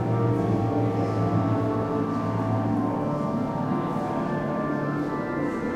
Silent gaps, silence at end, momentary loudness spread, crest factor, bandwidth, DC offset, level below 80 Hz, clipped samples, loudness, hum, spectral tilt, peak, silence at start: none; 0 s; 3 LU; 14 dB; 9.6 kHz; under 0.1%; -52 dBFS; under 0.1%; -26 LUFS; none; -9 dB/octave; -12 dBFS; 0 s